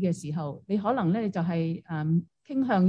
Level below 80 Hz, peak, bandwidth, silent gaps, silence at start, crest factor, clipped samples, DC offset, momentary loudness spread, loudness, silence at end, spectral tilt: -70 dBFS; -12 dBFS; 10.5 kHz; none; 0 s; 14 dB; under 0.1%; under 0.1%; 7 LU; -29 LUFS; 0 s; -8 dB/octave